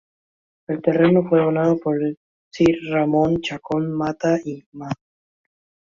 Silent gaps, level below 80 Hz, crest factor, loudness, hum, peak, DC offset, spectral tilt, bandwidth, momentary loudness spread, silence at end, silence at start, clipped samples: 2.17-2.51 s, 4.66-4.72 s; -54 dBFS; 18 dB; -20 LUFS; none; -4 dBFS; under 0.1%; -7.5 dB/octave; 7.4 kHz; 15 LU; 0.9 s; 0.7 s; under 0.1%